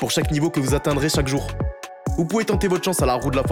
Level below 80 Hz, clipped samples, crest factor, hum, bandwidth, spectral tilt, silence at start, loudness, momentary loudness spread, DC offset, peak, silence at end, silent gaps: -32 dBFS; under 0.1%; 14 dB; none; 17.5 kHz; -5 dB/octave; 0 s; -22 LUFS; 8 LU; under 0.1%; -6 dBFS; 0 s; none